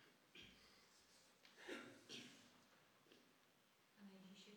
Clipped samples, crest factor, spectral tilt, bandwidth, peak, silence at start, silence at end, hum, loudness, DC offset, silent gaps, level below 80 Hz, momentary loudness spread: under 0.1%; 24 dB; -3 dB/octave; 19.5 kHz; -40 dBFS; 0 s; 0 s; none; -61 LUFS; under 0.1%; none; under -90 dBFS; 12 LU